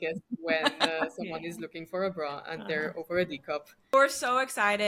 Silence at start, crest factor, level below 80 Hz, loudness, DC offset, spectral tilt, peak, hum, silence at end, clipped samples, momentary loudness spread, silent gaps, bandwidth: 0 s; 22 dB; -70 dBFS; -30 LUFS; under 0.1%; -3 dB/octave; -8 dBFS; none; 0 s; under 0.1%; 13 LU; none; 16.5 kHz